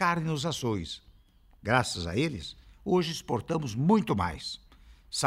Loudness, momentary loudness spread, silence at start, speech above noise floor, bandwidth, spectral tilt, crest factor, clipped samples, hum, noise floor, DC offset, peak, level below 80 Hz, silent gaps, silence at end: -30 LUFS; 15 LU; 0 s; 30 dB; 15.5 kHz; -5 dB/octave; 22 dB; under 0.1%; none; -59 dBFS; under 0.1%; -8 dBFS; -54 dBFS; none; 0 s